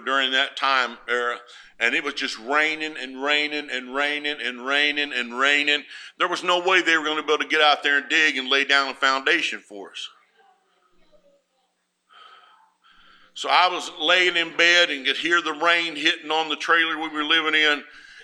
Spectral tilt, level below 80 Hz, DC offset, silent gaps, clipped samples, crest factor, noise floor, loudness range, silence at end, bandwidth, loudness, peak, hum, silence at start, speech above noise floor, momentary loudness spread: -1 dB/octave; -70 dBFS; under 0.1%; none; under 0.1%; 22 dB; -71 dBFS; 7 LU; 0 s; 13.5 kHz; -20 LUFS; -2 dBFS; none; 0 s; 49 dB; 11 LU